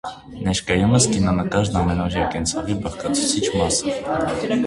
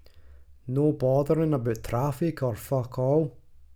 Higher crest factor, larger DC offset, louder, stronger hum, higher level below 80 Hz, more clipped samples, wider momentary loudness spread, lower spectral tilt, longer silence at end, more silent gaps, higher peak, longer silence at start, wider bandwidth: about the same, 18 dB vs 14 dB; neither; first, -20 LUFS vs -27 LUFS; neither; first, -36 dBFS vs -50 dBFS; neither; about the same, 8 LU vs 8 LU; second, -4.5 dB/octave vs -8.5 dB/octave; about the same, 0 s vs 0.1 s; neither; first, -4 dBFS vs -12 dBFS; about the same, 0.05 s vs 0.15 s; second, 11.5 kHz vs 17.5 kHz